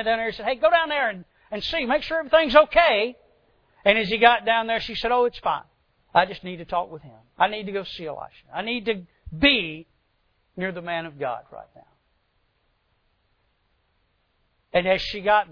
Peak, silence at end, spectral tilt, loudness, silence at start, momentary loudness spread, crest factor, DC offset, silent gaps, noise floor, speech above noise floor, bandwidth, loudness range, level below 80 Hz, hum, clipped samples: 0 dBFS; 0.1 s; -5.5 dB/octave; -22 LUFS; 0 s; 17 LU; 24 dB; under 0.1%; none; -69 dBFS; 46 dB; 5.4 kHz; 15 LU; -50 dBFS; none; under 0.1%